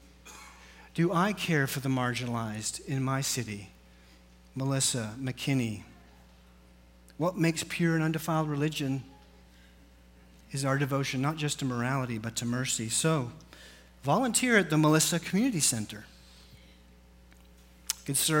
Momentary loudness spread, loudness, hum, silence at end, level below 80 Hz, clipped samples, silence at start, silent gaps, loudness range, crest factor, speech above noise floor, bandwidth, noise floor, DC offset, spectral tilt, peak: 16 LU; -29 LUFS; none; 0 s; -58 dBFS; under 0.1%; 0.25 s; none; 6 LU; 22 dB; 28 dB; 16.5 kHz; -56 dBFS; under 0.1%; -4 dB/octave; -8 dBFS